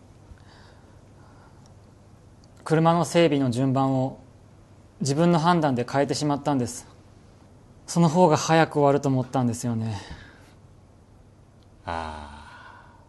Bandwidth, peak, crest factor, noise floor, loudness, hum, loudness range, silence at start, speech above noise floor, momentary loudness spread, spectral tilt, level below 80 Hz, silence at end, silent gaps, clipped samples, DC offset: 12.5 kHz; -6 dBFS; 20 dB; -53 dBFS; -23 LUFS; none; 7 LU; 0.3 s; 31 dB; 21 LU; -6 dB/octave; -56 dBFS; 0.3 s; none; under 0.1%; under 0.1%